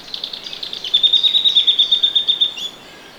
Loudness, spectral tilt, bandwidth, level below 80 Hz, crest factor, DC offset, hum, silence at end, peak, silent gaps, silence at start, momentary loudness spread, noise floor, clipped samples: -12 LUFS; 0 dB/octave; over 20 kHz; -58 dBFS; 16 dB; under 0.1%; none; 0 s; -2 dBFS; none; 0 s; 15 LU; -39 dBFS; under 0.1%